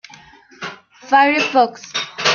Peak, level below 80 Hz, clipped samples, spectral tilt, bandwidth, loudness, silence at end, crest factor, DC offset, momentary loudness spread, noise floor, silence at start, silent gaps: 0 dBFS; -64 dBFS; under 0.1%; -2 dB/octave; 7.2 kHz; -16 LUFS; 0 s; 18 dB; under 0.1%; 18 LU; -44 dBFS; 0.6 s; none